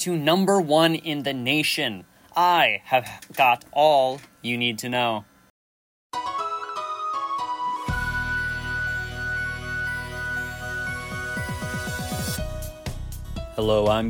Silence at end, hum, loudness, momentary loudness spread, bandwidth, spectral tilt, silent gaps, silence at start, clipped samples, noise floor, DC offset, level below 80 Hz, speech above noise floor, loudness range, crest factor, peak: 0 s; none; -24 LUFS; 13 LU; 17.5 kHz; -4 dB/octave; 5.50-6.10 s; 0 s; under 0.1%; under -90 dBFS; under 0.1%; -42 dBFS; over 68 dB; 8 LU; 18 dB; -6 dBFS